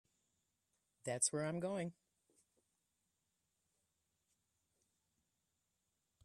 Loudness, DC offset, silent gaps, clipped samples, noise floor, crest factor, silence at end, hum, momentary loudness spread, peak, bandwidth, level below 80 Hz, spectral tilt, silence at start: -40 LUFS; under 0.1%; none; under 0.1%; -87 dBFS; 26 dB; 4.3 s; none; 12 LU; -22 dBFS; 12.5 kHz; -86 dBFS; -3.5 dB/octave; 1.05 s